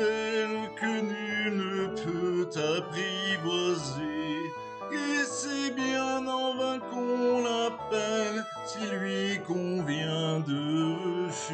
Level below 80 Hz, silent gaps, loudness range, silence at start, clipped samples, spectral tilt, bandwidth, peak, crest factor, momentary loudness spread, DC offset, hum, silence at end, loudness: -66 dBFS; none; 1 LU; 0 s; under 0.1%; -4.5 dB/octave; 9.2 kHz; -18 dBFS; 14 dB; 5 LU; under 0.1%; none; 0 s; -30 LUFS